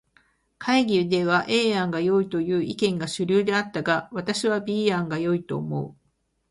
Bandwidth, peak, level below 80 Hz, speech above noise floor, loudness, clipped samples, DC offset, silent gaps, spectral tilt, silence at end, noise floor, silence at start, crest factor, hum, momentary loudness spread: 11.5 kHz; -8 dBFS; -62 dBFS; 47 dB; -24 LUFS; under 0.1%; under 0.1%; none; -5.5 dB/octave; 0.6 s; -71 dBFS; 0.6 s; 16 dB; none; 7 LU